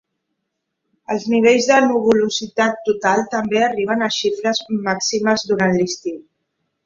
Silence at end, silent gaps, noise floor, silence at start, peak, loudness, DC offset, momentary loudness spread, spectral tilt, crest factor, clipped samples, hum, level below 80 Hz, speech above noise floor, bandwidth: 0.65 s; none; -76 dBFS; 1.1 s; -2 dBFS; -17 LUFS; under 0.1%; 8 LU; -4 dB/octave; 18 dB; under 0.1%; none; -60 dBFS; 59 dB; 7.6 kHz